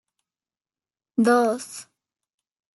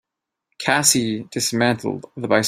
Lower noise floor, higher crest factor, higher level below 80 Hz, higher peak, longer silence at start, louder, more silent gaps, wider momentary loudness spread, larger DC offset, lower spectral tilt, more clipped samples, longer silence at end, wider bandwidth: first, under -90 dBFS vs -76 dBFS; about the same, 20 dB vs 20 dB; second, -78 dBFS vs -60 dBFS; second, -6 dBFS vs 0 dBFS; first, 1.2 s vs 0.6 s; about the same, -22 LUFS vs -20 LUFS; neither; first, 19 LU vs 12 LU; neither; first, -4.5 dB/octave vs -3 dB/octave; neither; first, 0.95 s vs 0 s; second, 12 kHz vs 16 kHz